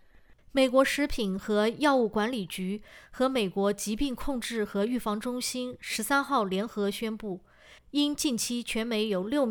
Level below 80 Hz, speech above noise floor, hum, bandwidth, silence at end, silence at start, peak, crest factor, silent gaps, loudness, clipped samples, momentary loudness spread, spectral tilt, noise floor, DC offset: -50 dBFS; 28 dB; none; over 20 kHz; 0 s; 0.55 s; -10 dBFS; 18 dB; none; -29 LUFS; under 0.1%; 9 LU; -4 dB/octave; -56 dBFS; under 0.1%